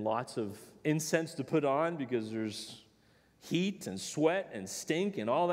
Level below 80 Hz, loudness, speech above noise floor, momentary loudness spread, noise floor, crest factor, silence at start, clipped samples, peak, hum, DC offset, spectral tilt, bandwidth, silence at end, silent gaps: -78 dBFS; -34 LUFS; 33 dB; 10 LU; -66 dBFS; 20 dB; 0 s; under 0.1%; -14 dBFS; none; under 0.1%; -5 dB/octave; 16 kHz; 0 s; none